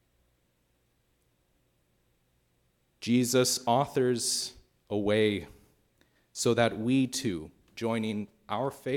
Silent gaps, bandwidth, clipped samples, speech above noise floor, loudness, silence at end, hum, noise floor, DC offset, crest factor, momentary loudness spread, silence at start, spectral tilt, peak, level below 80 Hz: none; 18 kHz; under 0.1%; 44 dB; -29 LUFS; 0 s; none; -72 dBFS; under 0.1%; 20 dB; 12 LU; 3 s; -4 dB/octave; -10 dBFS; -66 dBFS